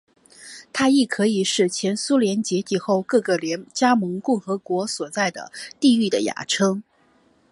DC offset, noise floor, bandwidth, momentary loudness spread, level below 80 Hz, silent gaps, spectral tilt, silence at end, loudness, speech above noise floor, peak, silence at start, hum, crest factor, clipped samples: under 0.1%; -59 dBFS; 11.5 kHz; 8 LU; -68 dBFS; none; -4 dB/octave; 0.7 s; -21 LUFS; 38 dB; -4 dBFS; 0.4 s; none; 18 dB; under 0.1%